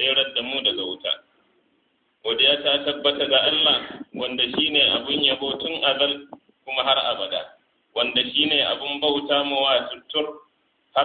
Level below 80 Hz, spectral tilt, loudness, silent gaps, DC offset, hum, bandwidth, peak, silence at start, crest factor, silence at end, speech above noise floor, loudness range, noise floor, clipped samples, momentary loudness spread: -62 dBFS; -7 dB/octave; -21 LUFS; none; under 0.1%; none; 4.7 kHz; -4 dBFS; 0 s; 18 dB; 0 s; 45 dB; 3 LU; -67 dBFS; under 0.1%; 11 LU